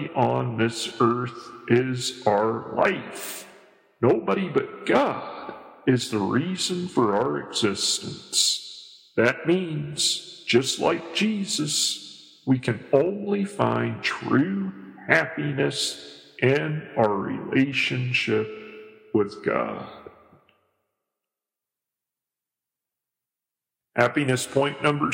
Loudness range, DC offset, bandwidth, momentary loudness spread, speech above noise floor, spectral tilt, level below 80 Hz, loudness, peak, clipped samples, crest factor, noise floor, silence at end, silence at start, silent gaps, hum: 5 LU; under 0.1%; 16.5 kHz; 12 LU; 65 dB; -4 dB/octave; -66 dBFS; -24 LUFS; -2 dBFS; under 0.1%; 22 dB; -89 dBFS; 0 s; 0 s; none; none